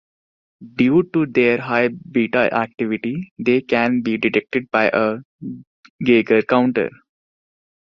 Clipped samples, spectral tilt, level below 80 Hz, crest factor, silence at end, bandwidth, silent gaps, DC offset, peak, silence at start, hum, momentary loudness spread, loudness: under 0.1%; -8 dB/octave; -58 dBFS; 18 dB; 0.95 s; 6.2 kHz; 3.31-3.36 s, 5.25-5.39 s, 5.67-5.83 s, 5.90-5.99 s; under 0.1%; -2 dBFS; 0.6 s; none; 11 LU; -18 LUFS